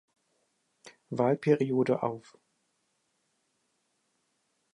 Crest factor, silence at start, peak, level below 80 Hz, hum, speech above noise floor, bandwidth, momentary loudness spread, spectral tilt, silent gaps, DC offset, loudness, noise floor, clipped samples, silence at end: 22 dB; 0.85 s; -10 dBFS; -80 dBFS; none; 49 dB; 11 kHz; 12 LU; -8 dB/octave; none; under 0.1%; -29 LUFS; -77 dBFS; under 0.1%; 2.55 s